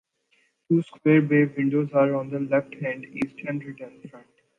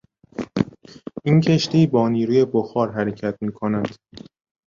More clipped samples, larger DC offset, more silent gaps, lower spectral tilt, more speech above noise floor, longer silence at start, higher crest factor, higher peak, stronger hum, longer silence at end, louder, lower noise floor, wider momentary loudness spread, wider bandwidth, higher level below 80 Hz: neither; neither; neither; first, -9.5 dB/octave vs -7.5 dB/octave; first, 43 dB vs 20 dB; first, 0.7 s vs 0.4 s; about the same, 18 dB vs 18 dB; second, -8 dBFS vs -2 dBFS; neither; about the same, 0.4 s vs 0.5 s; second, -24 LUFS vs -21 LUFS; first, -67 dBFS vs -39 dBFS; about the same, 13 LU vs 14 LU; second, 4.2 kHz vs 7.4 kHz; second, -72 dBFS vs -54 dBFS